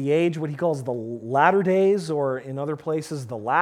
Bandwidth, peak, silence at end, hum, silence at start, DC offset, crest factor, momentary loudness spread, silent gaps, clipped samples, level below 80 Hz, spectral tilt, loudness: 13.5 kHz; -4 dBFS; 0 s; none; 0 s; under 0.1%; 20 dB; 11 LU; none; under 0.1%; -70 dBFS; -7 dB/octave; -23 LUFS